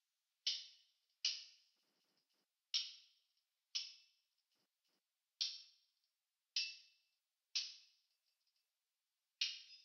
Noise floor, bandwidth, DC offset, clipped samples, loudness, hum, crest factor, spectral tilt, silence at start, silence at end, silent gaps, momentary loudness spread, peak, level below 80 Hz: under -90 dBFS; 7 kHz; under 0.1%; under 0.1%; -44 LUFS; none; 26 dB; 9.5 dB/octave; 0.45 s; 0.05 s; none; 16 LU; -24 dBFS; under -90 dBFS